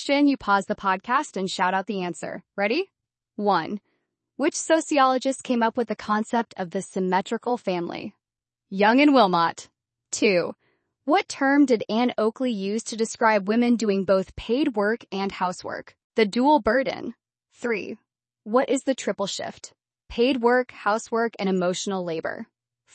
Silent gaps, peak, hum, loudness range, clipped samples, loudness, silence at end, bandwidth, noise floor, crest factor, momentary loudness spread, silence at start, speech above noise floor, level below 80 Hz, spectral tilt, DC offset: 16.04-16.10 s; -6 dBFS; none; 4 LU; under 0.1%; -24 LUFS; 0.5 s; 8.8 kHz; -89 dBFS; 18 dB; 14 LU; 0 s; 66 dB; -60 dBFS; -4.5 dB/octave; under 0.1%